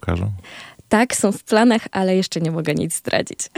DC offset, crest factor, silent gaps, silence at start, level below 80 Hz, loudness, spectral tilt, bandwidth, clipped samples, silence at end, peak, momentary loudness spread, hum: under 0.1%; 18 dB; none; 0.05 s; -44 dBFS; -19 LUFS; -4.5 dB/octave; 16.5 kHz; under 0.1%; 0.1 s; -2 dBFS; 11 LU; none